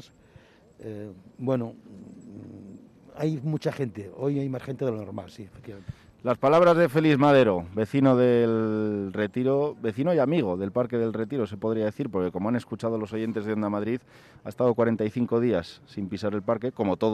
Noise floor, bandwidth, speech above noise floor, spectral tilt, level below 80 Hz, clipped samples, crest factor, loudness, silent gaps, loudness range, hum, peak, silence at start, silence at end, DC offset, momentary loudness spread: -55 dBFS; 13.5 kHz; 29 dB; -8 dB/octave; -64 dBFS; under 0.1%; 16 dB; -25 LUFS; none; 11 LU; none; -10 dBFS; 0.8 s; 0 s; under 0.1%; 22 LU